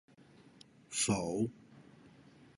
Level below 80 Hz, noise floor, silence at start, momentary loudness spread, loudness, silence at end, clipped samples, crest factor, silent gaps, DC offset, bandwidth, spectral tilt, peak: -66 dBFS; -61 dBFS; 0.9 s; 10 LU; -35 LUFS; 0.5 s; under 0.1%; 22 dB; none; under 0.1%; 11.5 kHz; -4 dB/octave; -18 dBFS